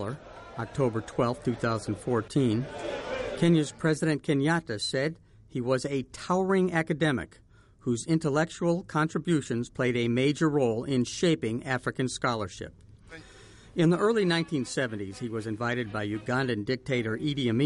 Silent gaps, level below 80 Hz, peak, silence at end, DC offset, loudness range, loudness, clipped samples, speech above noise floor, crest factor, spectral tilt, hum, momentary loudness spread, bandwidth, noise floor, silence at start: none; -56 dBFS; -12 dBFS; 0 s; under 0.1%; 2 LU; -28 LUFS; under 0.1%; 24 dB; 16 dB; -6 dB/octave; none; 11 LU; 11.5 kHz; -51 dBFS; 0 s